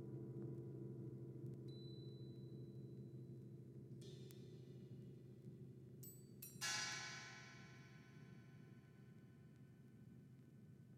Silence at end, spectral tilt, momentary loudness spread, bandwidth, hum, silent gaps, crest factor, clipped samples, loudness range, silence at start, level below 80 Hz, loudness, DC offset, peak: 0 s; -3.5 dB/octave; 16 LU; 15.5 kHz; none; none; 24 dB; under 0.1%; 9 LU; 0 s; -82 dBFS; -54 LUFS; under 0.1%; -32 dBFS